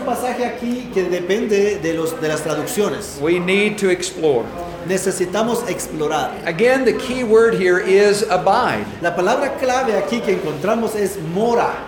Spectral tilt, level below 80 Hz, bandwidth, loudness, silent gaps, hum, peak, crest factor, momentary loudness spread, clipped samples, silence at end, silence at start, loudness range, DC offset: -4.5 dB/octave; -48 dBFS; 19 kHz; -18 LUFS; none; none; -2 dBFS; 16 dB; 8 LU; under 0.1%; 0 s; 0 s; 3 LU; under 0.1%